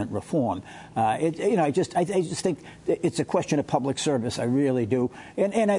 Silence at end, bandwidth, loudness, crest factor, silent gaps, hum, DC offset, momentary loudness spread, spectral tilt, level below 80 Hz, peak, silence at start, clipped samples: 0 s; 11 kHz; -26 LUFS; 18 dB; none; none; under 0.1%; 6 LU; -6 dB/octave; -62 dBFS; -8 dBFS; 0 s; under 0.1%